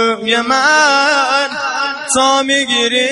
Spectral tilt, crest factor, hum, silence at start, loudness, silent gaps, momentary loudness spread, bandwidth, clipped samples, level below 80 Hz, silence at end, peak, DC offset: -0.5 dB/octave; 12 dB; none; 0 s; -12 LUFS; none; 8 LU; 11.5 kHz; under 0.1%; -56 dBFS; 0 s; 0 dBFS; under 0.1%